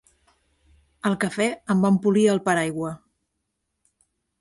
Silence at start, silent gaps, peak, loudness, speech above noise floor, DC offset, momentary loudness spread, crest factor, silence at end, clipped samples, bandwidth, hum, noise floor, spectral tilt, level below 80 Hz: 1.05 s; none; -6 dBFS; -22 LUFS; 57 dB; under 0.1%; 11 LU; 18 dB; 1.45 s; under 0.1%; 11.5 kHz; none; -78 dBFS; -6 dB/octave; -62 dBFS